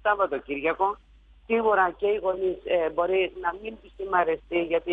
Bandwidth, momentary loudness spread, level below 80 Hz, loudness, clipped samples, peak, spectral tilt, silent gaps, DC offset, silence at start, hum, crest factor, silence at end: 3.9 kHz; 8 LU; -54 dBFS; -26 LUFS; under 0.1%; -10 dBFS; -7 dB/octave; none; under 0.1%; 0.05 s; none; 16 dB; 0 s